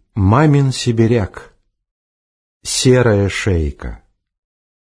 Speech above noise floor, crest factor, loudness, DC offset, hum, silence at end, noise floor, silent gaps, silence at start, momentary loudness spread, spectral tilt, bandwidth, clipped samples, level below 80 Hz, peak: over 76 dB; 16 dB; -14 LUFS; under 0.1%; none; 1.05 s; under -90 dBFS; 1.91-2.60 s; 0.15 s; 16 LU; -5.5 dB/octave; 10.5 kHz; under 0.1%; -34 dBFS; 0 dBFS